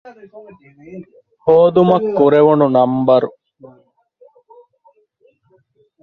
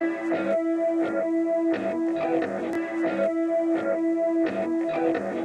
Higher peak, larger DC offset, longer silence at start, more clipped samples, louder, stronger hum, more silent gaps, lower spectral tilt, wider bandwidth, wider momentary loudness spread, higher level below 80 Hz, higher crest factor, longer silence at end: first, 0 dBFS vs -12 dBFS; neither; about the same, 0.05 s vs 0 s; neither; first, -13 LUFS vs -25 LUFS; neither; neither; first, -10 dB/octave vs -7 dB/octave; second, 5 kHz vs 8.6 kHz; first, 25 LU vs 3 LU; first, -58 dBFS vs -70 dBFS; about the same, 16 dB vs 12 dB; first, 2.75 s vs 0 s